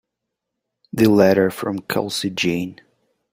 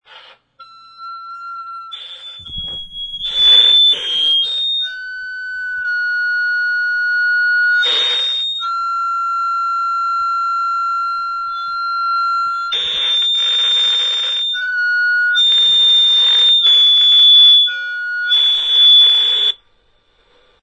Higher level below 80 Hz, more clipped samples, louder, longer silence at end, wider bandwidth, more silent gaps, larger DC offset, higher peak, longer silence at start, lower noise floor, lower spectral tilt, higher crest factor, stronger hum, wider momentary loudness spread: second, -58 dBFS vs -52 dBFS; neither; second, -19 LUFS vs -11 LUFS; second, 0.6 s vs 1.1 s; first, 16 kHz vs 11 kHz; neither; neither; about the same, -2 dBFS vs -2 dBFS; first, 0.95 s vs 0.1 s; first, -80 dBFS vs -56 dBFS; first, -5.5 dB/octave vs 2 dB/octave; about the same, 18 dB vs 14 dB; neither; second, 12 LU vs 19 LU